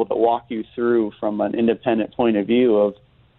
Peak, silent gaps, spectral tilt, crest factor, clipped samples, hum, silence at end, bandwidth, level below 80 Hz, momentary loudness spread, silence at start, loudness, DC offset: -4 dBFS; none; -10.5 dB/octave; 16 dB; under 0.1%; none; 0.45 s; 4.1 kHz; -58 dBFS; 7 LU; 0 s; -20 LUFS; under 0.1%